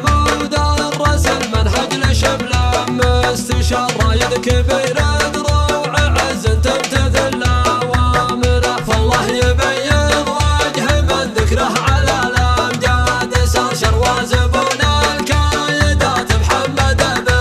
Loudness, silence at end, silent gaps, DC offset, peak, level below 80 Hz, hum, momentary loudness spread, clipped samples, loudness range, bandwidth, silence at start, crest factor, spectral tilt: -14 LUFS; 0 s; none; under 0.1%; 0 dBFS; -22 dBFS; none; 2 LU; under 0.1%; 1 LU; 14.5 kHz; 0 s; 14 dB; -4.5 dB/octave